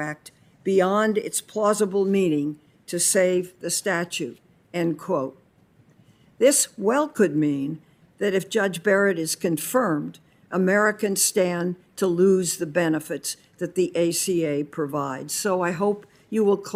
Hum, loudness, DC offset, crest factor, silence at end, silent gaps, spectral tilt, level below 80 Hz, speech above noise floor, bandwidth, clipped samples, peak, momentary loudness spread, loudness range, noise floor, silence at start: none; -23 LUFS; under 0.1%; 18 dB; 0 s; none; -4 dB/octave; -70 dBFS; 35 dB; 16 kHz; under 0.1%; -6 dBFS; 11 LU; 3 LU; -58 dBFS; 0 s